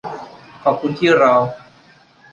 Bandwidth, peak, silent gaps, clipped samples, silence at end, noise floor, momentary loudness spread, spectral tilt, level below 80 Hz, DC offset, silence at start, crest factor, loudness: 8.8 kHz; -2 dBFS; none; under 0.1%; 0.75 s; -49 dBFS; 23 LU; -6 dB/octave; -60 dBFS; under 0.1%; 0.05 s; 16 dB; -16 LUFS